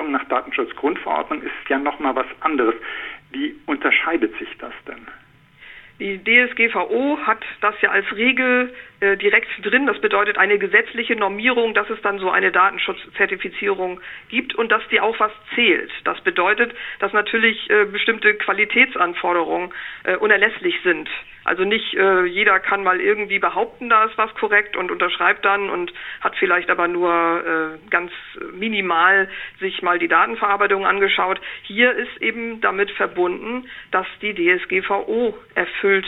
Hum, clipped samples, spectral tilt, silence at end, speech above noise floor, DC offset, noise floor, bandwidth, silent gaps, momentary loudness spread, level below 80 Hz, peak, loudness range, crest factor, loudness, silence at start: none; under 0.1%; -6.5 dB/octave; 0 s; 28 dB; under 0.1%; -47 dBFS; 4.1 kHz; none; 11 LU; -56 dBFS; 0 dBFS; 4 LU; 20 dB; -18 LUFS; 0 s